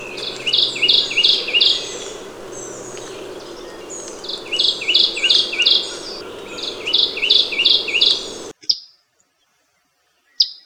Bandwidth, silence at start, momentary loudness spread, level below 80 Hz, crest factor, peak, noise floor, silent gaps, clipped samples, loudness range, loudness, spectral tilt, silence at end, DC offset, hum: over 20 kHz; 0 s; 19 LU; -54 dBFS; 20 dB; 0 dBFS; -64 dBFS; none; under 0.1%; 6 LU; -15 LUFS; 0 dB/octave; 0.1 s; under 0.1%; none